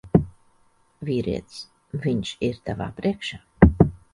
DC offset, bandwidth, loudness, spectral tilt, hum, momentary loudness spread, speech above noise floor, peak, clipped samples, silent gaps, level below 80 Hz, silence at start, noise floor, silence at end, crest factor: under 0.1%; 11 kHz; -24 LUFS; -7.5 dB/octave; none; 18 LU; 34 dB; 0 dBFS; under 0.1%; none; -34 dBFS; 0.05 s; -61 dBFS; 0.15 s; 24 dB